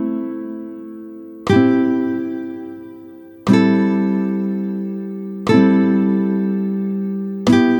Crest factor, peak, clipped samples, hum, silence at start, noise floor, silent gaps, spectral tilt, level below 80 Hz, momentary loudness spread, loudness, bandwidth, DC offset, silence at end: 16 dB; 0 dBFS; under 0.1%; none; 0 s; -38 dBFS; none; -7.5 dB/octave; -56 dBFS; 19 LU; -18 LUFS; 18.5 kHz; under 0.1%; 0 s